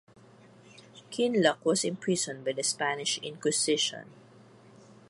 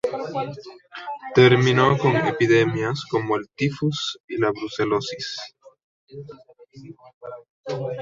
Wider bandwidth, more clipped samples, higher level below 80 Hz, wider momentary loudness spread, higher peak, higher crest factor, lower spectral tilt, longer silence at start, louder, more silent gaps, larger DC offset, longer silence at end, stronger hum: first, 11.5 kHz vs 7.8 kHz; neither; second, -78 dBFS vs -58 dBFS; second, 6 LU vs 23 LU; second, -10 dBFS vs -4 dBFS; about the same, 22 dB vs 20 dB; second, -2.5 dB/octave vs -6 dB/octave; first, 0.65 s vs 0.05 s; second, -28 LUFS vs -21 LUFS; second, none vs 4.20-4.28 s, 5.84-6.07 s, 7.14-7.21 s, 7.50-7.64 s; neither; first, 0.95 s vs 0 s; neither